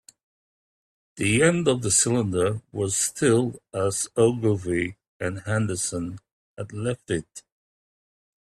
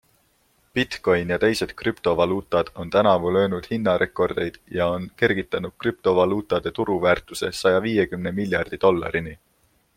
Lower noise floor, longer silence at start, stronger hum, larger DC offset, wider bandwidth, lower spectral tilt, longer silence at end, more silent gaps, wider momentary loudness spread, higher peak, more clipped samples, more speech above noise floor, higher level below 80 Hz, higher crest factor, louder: first, under -90 dBFS vs -64 dBFS; first, 1.15 s vs 0.75 s; neither; neither; second, 14.5 kHz vs 16.5 kHz; about the same, -4.5 dB/octave vs -5.5 dB/octave; first, 1 s vs 0.6 s; first, 5.08-5.20 s, 6.32-6.55 s vs none; first, 13 LU vs 7 LU; about the same, -6 dBFS vs -4 dBFS; neither; first, over 66 dB vs 42 dB; about the same, -56 dBFS vs -52 dBFS; about the same, 20 dB vs 20 dB; about the same, -24 LUFS vs -22 LUFS